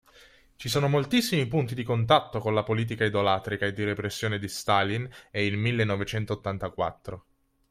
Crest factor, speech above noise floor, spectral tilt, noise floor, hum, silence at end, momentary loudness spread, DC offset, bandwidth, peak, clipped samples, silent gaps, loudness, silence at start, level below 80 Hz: 22 dB; 29 dB; -5.5 dB/octave; -56 dBFS; none; 0.5 s; 9 LU; under 0.1%; 16 kHz; -6 dBFS; under 0.1%; none; -27 LUFS; 0.6 s; -56 dBFS